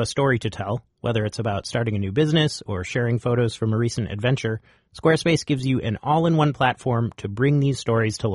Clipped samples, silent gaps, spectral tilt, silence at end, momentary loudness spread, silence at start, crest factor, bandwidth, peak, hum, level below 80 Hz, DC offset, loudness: under 0.1%; none; -6 dB/octave; 0 s; 7 LU; 0 s; 16 dB; 11.5 kHz; -6 dBFS; none; -50 dBFS; under 0.1%; -23 LUFS